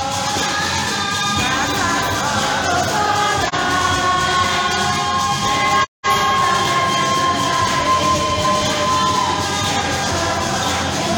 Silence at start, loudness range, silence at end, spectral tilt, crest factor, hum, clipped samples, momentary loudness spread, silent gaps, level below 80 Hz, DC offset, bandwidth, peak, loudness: 0 s; 1 LU; 0 s; -2.5 dB/octave; 14 dB; none; under 0.1%; 3 LU; 5.88-6.03 s; -44 dBFS; under 0.1%; 19 kHz; -4 dBFS; -17 LUFS